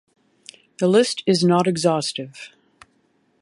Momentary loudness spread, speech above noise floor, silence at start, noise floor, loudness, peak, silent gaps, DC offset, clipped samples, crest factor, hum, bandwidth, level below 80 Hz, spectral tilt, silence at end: 19 LU; 45 dB; 0.8 s; -64 dBFS; -19 LUFS; -4 dBFS; none; under 0.1%; under 0.1%; 18 dB; none; 11.5 kHz; -68 dBFS; -5 dB/octave; 0.95 s